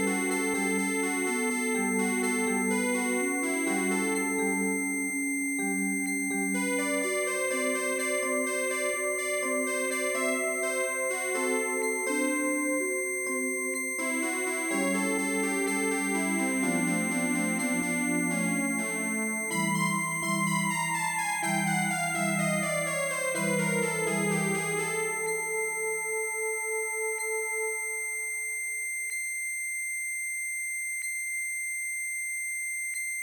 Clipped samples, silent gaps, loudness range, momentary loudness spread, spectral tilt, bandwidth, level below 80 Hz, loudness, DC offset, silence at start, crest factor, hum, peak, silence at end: under 0.1%; none; 3 LU; 3 LU; -3.5 dB/octave; 19 kHz; -80 dBFS; -28 LUFS; under 0.1%; 0 s; 14 dB; none; -14 dBFS; 0 s